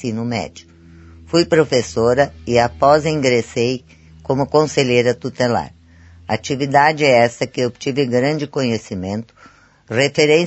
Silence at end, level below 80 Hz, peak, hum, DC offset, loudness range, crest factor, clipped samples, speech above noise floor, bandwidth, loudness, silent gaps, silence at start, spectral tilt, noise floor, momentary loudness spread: 0 s; -48 dBFS; 0 dBFS; none; under 0.1%; 2 LU; 18 dB; under 0.1%; 28 dB; 8.4 kHz; -17 LUFS; none; 0 s; -5 dB/octave; -44 dBFS; 11 LU